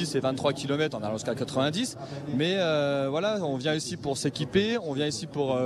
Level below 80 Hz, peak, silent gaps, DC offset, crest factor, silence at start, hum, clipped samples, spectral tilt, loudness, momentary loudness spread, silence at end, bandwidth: -60 dBFS; -12 dBFS; none; under 0.1%; 16 dB; 0 s; none; under 0.1%; -5 dB/octave; -28 LUFS; 6 LU; 0 s; 14 kHz